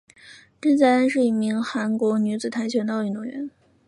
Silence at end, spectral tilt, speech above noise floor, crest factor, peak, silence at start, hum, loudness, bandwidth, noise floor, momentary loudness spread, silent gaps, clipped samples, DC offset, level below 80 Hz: 0.4 s; -6 dB/octave; 27 dB; 16 dB; -6 dBFS; 0.25 s; none; -22 LUFS; 11 kHz; -49 dBFS; 13 LU; none; under 0.1%; under 0.1%; -70 dBFS